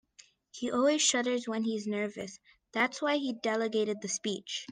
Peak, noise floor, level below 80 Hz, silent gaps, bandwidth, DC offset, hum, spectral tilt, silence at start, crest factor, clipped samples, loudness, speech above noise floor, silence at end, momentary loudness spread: -12 dBFS; -61 dBFS; -78 dBFS; none; 10 kHz; under 0.1%; none; -2.5 dB/octave; 0.55 s; 20 dB; under 0.1%; -31 LUFS; 30 dB; 0 s; 12 LU